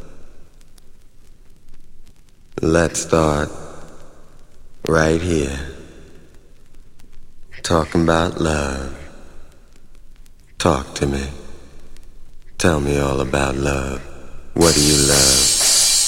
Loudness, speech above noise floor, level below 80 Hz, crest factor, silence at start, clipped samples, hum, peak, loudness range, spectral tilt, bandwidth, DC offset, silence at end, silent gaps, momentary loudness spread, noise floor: -17 LUFS; 24 dB; -32 dBFS; 20 dB; 0 s; under 0.1%; none; 0 dBFS; 8 LU; -3 dB/octave; 16.5 kHz; under 0.1%; 0 s; none; 21 LU; -41 dBFS